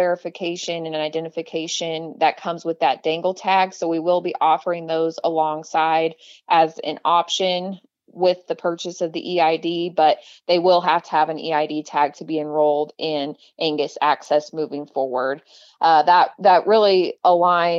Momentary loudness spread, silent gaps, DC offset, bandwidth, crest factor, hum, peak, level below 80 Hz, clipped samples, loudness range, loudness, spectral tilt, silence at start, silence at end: 11 LU; none; under 0.1%; 7.8 kHz; 16 dB; none; -4 dBFS; -80 dBFS; under 0.1%; 4 LU; -20 LUFS; -4 dB/octave; 0 s; 0 s